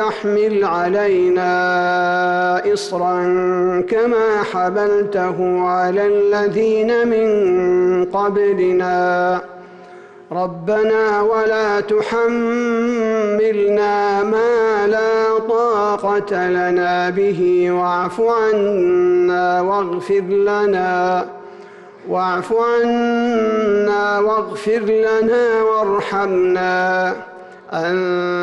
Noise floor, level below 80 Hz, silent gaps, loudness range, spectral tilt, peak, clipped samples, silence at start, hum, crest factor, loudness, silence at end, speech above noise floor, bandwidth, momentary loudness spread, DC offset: -39 dBFS; -56 dBFS; none; 2 LU; -6 dB/octave; -8 dBFS; under 0.1%; 0 s; none; 8 dB; -16 LUFS; 0 s; 23 dB; 11 kHz; 4 LU; under 0.1%